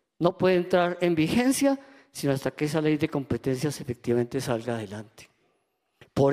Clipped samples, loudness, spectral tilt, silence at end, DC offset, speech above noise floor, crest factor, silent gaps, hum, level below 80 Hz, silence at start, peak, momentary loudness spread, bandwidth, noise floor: under 0.1%; -26 LUFS; -6 dB/octave; 0 s; under 0.1%; 48 dB; 20 dB; none; none; -58 dBFS; 0.2 s; -6 dBFS; 10 LU; 15.5 kHz; -74 dBFS